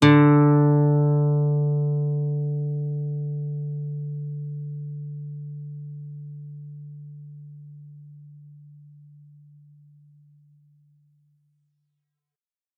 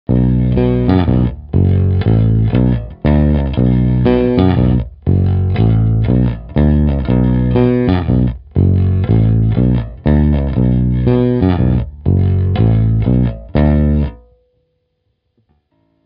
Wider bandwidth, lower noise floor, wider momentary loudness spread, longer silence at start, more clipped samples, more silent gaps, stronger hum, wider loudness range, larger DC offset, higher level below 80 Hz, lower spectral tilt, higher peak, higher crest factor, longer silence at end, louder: second, 3.9 kHz vs 5 kHz; first, under -90 dBFS vs -66 dBFS; first, 25 LU vs 3 LU; about the same, 0 s vs 0.1 s; neither; neither; neither; first, 24 LU vs 2 LU; neither; second, -74 dBFS vs -22 dBFS; second, -7.5 dB/octave vs -9.5 dB/octave; second, -4 dBFS vs 0 dBFS; first, 22 dB vs 12 dB; first, 4.2 s vs 1.9 s; second, -23 LUFS vs -13 LUFS